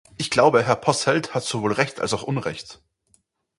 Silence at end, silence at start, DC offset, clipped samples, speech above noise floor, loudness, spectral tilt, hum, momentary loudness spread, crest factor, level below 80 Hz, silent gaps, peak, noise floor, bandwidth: 0.85 s; 0.2 s; under 0.1%; under 0.1%; 43 dB; -21 LUFS; -4.5 dB/octave; none; 12 LU; 20 dB; -56 dBFS; none; -2 dBFS; -65 dBFS; 11.5 kHz